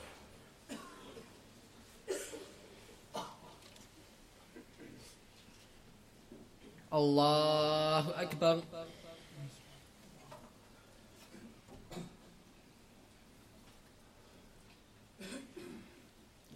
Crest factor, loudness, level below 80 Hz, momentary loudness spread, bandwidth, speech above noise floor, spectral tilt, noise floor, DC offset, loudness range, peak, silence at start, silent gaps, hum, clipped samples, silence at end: 24 dB; -35 LUFS; -68 dBFS; 28 LU; 16 kHz; 31 dB; -5 dB/octave; -62 dBFS; under 0.1%; 23 LU; -18 dBFS; 0 s; none; none; under 0.1%; 0 s